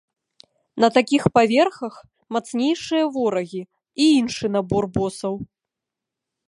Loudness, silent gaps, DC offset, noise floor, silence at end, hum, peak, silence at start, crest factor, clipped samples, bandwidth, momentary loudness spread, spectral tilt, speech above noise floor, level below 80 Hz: -20 LUFS; none; under 0.1%; -85 dBFS; 1 s; none; -2 dBFS; 0.75 s; 20 dB; under 0.1%; 11.5 kHz; 17 LU; -5.5 dB/octave; 65 dB; -54 dBFS